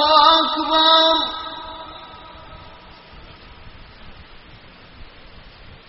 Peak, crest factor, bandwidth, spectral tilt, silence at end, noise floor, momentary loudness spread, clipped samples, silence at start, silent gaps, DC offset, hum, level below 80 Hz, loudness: 0 dBFS; 22 dB; 6 kHz; 0.5 dB/octave; 0.4 s; -43 dBFS; 27 LU; under 0.1%; 0 s; none; under 0.1%; none; -46 dBFS; -14 LUFS